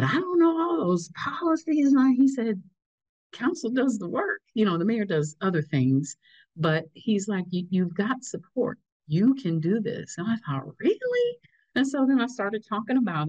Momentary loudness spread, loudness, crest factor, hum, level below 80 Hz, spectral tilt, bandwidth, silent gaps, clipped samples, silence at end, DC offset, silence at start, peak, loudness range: 9 LU; -26 LUFS; 12 dB; none; -72 dBFS; -6.5 dB/octave; 8.8 kHz; 2.86-2.98 s, 3.09-3.30 s, 8.92-9.00 s; under 0.1%; 0 s; under 0.1%; 0 s; -12 dBFS; 3 LU